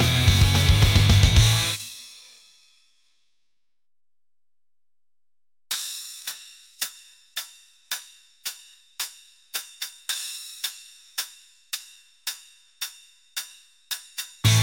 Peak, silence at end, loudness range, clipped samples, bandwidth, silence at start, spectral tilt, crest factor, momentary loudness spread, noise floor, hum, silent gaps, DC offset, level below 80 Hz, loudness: -6 dBFS; 0 s; 15 LU; under 0.1%; 17 kHz; 0 s; -3.5 dB/octave; 20 dB; 22 LU; under -90 dBFS; none; none; under 0.1%; -34 dBFS; -25 LUFS